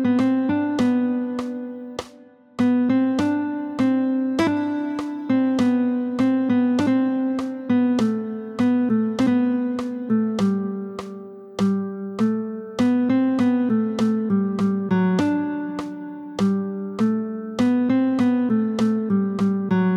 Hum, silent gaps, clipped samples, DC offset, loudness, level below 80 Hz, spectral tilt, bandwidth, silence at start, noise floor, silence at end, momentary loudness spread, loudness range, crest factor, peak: none; none; under 0.1%; under 0.1%; -22 LUFS; -60 dBFS; -7.5 dB/octave; 9.8 kHz; 0 s; -48 dBFS; 0 s; 10 LU; 2 LU; 12 dB; -8 dBFS